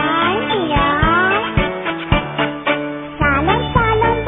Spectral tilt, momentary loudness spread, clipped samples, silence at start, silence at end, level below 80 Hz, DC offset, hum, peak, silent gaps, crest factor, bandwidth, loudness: -9.5 dB/octave; 6 LU; under 0.1%; 0 s; 0 s; -28 dBFS; under 0.1%; none; 0 dBFS; none; 16 dB; 3.9 kHz; -16 LUFS